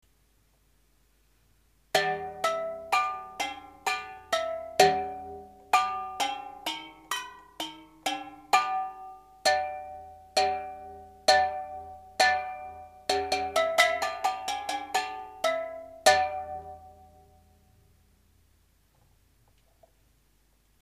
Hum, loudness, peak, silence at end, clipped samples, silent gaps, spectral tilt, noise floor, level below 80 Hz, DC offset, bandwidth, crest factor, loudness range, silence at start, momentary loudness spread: none; -28 LUFS; -4 dBFS; 3.9 s; under 0.1%; none; -1 dB/octave; -66 dBFS; -62 dBFS; under 0.1%; 15.5 kHz; 26 dB; 5 LU; 1.95 s; 18 LU